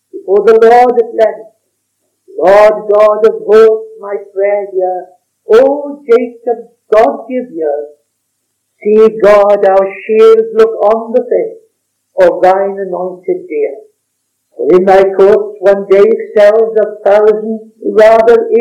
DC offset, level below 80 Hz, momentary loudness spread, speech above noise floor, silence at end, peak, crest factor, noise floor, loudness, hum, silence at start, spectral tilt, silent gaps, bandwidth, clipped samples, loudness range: under 0.1%; -48 dBFS; 13 LU; 58 dB; 0 s; 0 dBFS; 8 dB; -66 dBFS; -9 LUFS; none; 0.15 s; -6 dB/octave; none; 9 kHz; 5%; 5 LU